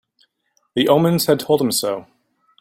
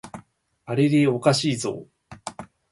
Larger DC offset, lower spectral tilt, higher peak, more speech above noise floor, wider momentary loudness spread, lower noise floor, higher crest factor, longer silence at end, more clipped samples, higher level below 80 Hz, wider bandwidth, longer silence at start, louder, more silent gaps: neither; about the same, -5 dB/octave vs -5.5 dB/octave; first, -2 dBFS vs -6 dBFS; first, 50 dB vs 31 dB; second, 11 LU vs 23 LU; first, -67 dBFS vs -52 dBFS; about the same, 18 dB vs 20 dB; first, 0.6 s vs 0.25 s; neither; about the same, -60 dBFS vs -62 dBFS; first, 16.5 kHz vs 11.5 kHz; first, 0.75 s vs 0.05 s; first, -18 LUFS vs -22 LUFS; neither